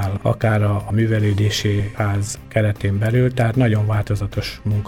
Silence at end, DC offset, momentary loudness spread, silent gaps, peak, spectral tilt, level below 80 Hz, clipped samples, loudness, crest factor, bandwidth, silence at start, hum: 0 s; under 0.1%; 5 LU; none; -4 dBFS; -6.5 dB/octave; -40 dBFS; under 0.1%; -19 LUFS; 14 dB; 14.5 kHz; 0 s; none